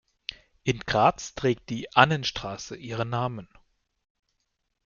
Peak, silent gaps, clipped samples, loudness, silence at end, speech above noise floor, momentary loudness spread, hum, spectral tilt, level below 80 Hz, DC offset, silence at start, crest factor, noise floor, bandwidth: -2 dBFS; none; under 0.1%; -26 LUFS; 1.4 s; 52 dB; 18 LU; none; -5 dB/octave; -54 dBFS; under 0.1%; 0.3 s; 26 dB; -78 dBFS; 7.4 kHz